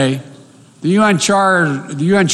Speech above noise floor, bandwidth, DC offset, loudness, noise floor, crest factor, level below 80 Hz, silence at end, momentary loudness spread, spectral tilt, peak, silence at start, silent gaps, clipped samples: 28 dB; 12.5 kHz; under 0.1%; -14 LUFS; -42 dBFS; 12 dB; -54 dBFS; 0 s; 9 LU; -4.5 dB/octave; -2 dBFS; 0 s; none; under 0.1%